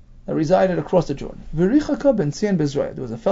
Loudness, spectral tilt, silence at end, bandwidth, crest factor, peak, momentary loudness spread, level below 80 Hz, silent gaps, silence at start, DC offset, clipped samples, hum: -20 LUFS; -7.5 dB/octave; 0 s; 7.8 kHz; 16 dB; -4 dBFS; 10 LU; -40 dBFS; none; 0.1 s; under 0.1%; under 0.1%; none